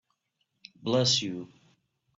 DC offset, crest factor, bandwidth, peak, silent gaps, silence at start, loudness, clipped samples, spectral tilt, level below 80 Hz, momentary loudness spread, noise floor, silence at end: under 0.1%; 20 dB; 8 kHz; -12 dBFS; none; 0.8 s; -27 LUFS; under 0.1%; -4 dB/octave; -70 dBFS; 18 LU; -78 dBFS; 0.7 s